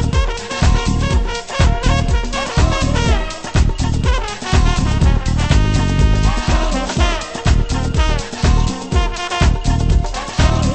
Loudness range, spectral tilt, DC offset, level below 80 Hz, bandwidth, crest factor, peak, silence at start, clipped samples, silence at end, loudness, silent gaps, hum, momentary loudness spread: 1 LU; -5.5 dB/octave; under 0.1%; -16 dBFS; 8.8 kHz; 14 dB; 0 dBFS; 0 s; under 0.1%; 0 s; -17 LUFS; none; none; 4 LU